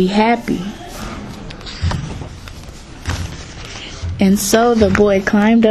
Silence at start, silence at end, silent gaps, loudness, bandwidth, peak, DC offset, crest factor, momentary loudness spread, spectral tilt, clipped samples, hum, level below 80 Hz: 0 s; 0 s; none; -15 LUFS; 13.5 kHz; 0 dBFS; under 0.1%; 16 dB; 19 LU; -5.5 dB/octave; under 0.1%; none; -32 dBFS